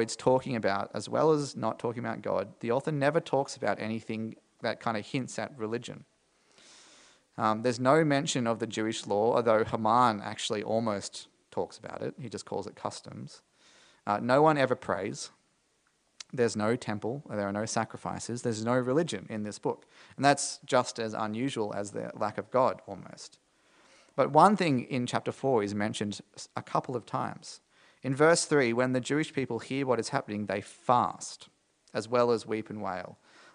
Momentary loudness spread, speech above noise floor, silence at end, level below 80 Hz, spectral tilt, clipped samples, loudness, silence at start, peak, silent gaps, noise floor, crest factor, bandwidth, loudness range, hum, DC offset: 16 LU; 42 dB; 0.4 s; -74 dBFS; -5 dB/octave; under 0.1%; -30 LUFS; 0 s; -6 dBFS; none; -72 dBFS; 24 dB; 10.5 kHz; 6 LU; none; under 0.1%